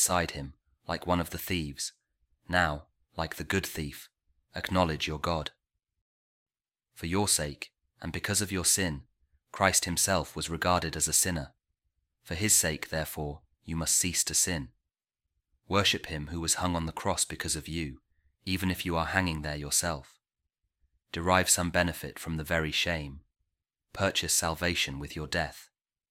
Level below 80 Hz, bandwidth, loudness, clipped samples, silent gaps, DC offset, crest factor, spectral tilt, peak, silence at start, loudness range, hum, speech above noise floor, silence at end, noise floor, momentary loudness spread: -50 dBFS; 16.5 kHz; -29 LUFS; under 0.1%; 6.01-6.46 s; under 0.1%; 24 dB; -2.5 dB/octave; -8 dBFS; 0 s; 5 LU; none; 57 dB; 0.45 s; -88 dBFS; 16 LU